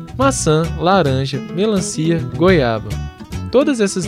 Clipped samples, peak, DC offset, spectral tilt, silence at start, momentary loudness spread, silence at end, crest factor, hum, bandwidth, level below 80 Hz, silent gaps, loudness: under 0.1%; 0 dBFS; under 0.1%; -5.5 dB/octave; 0 s; 11 LU; 0 s; 16 dB; none; 15 kHz; -34 dBFS; none; -16 LUFS